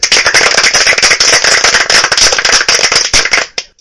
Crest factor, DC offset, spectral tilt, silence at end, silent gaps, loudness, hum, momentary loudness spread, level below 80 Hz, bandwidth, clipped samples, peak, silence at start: 8 dB; under 0.1%; 1 dB/octave; 0.15 s; none; -6 LUFS; none; 3 LU; -34 dBFS; 12 kHz; 2%; 0 dBFS; 0 s